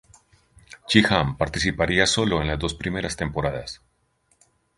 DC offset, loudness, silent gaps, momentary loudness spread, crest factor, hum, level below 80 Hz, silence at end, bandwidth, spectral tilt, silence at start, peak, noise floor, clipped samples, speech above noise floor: under 0.1%; -22 LUFS; none; 14 LU; 24 dB; none; -40 dBFS; 1.05 s; 11.5 kHz; -4 dB/octave; 0.7 s; 0 dBFS; -67 dBFS; under 0.1%; 44 dB